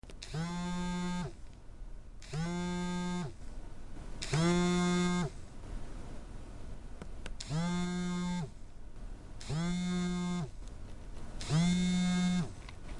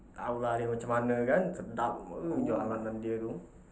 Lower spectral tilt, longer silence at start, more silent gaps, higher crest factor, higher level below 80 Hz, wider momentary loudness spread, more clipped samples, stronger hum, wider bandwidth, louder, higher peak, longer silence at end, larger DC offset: second, -5.5 dB/octave vs -7.5 dB/octave; about the same, 0.05 s vs 0 s; neither; about the same, 16 dB vs 18 dB; first, -46 dBFS vs -58 dBFS; first, 21 LU vs 8 LU; neither; neither; first, 11.5 kHz vs 8 kHz; about the same, -35 LUFS vs -33 LUFS; about the same, -18 dBFS vs -16 dBFS; about the same, 0 s vs 0.1 s; neither